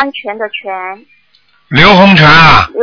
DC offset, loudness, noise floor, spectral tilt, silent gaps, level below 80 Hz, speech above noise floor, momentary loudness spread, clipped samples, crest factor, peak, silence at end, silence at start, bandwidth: under 0.1%; -4 LUFS; -52 dBFS; -6 dB/octave; none; -30 dBFS; 45 dB; 18 LU; 5%; 8 dB; 0 dBFS; 0 s; 0 s; 5.4 kHz